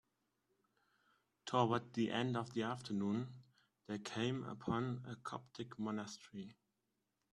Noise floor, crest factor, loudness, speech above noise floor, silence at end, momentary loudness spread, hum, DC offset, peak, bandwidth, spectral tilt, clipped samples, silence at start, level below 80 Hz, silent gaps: -87 dBFS; 22 dB; -42 LUFS; 46 dB; 0.8 s; 14 LU; none; under 0.1%; -22 dBFS; 11.5 kHz; -6 dB/octave; under 0.1%; 1.45 s; -78 dBFS; none